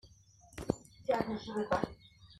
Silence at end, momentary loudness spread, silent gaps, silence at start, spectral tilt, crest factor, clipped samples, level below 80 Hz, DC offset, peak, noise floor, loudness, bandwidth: 0 s; 15 LU; none; 0.05 s; -6 dB/octave; 24 dB; under 0.1%; -58 dBFS; under 0.1%; -14 dBFS; -61 dBFS; -37 LUFS; 13.5 kHz